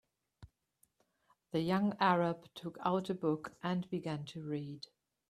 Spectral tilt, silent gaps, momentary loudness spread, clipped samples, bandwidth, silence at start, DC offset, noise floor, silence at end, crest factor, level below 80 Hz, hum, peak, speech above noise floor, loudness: -7 dB/octave; none; 15 LU; under 0.1%; 13.5 kHz; 0.4 s; under 0.1%; -76 dBFS; 0.5 s; 22 dB; -74 dBFS; none; -16 dBFS; 41 dB; -36 LUFS